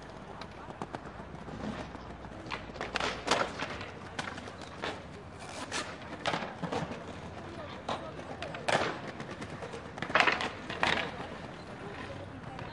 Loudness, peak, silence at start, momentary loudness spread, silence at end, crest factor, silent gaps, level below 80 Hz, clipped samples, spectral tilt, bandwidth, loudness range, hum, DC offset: -36 LUFS; -2 dBFS; 0 s; 14 LU; 0 s; 34 dB; none; -58 dBFS; under 0.1%; -4 dB/octave; 11.5 kHz; 6 LU; none; under 0.1%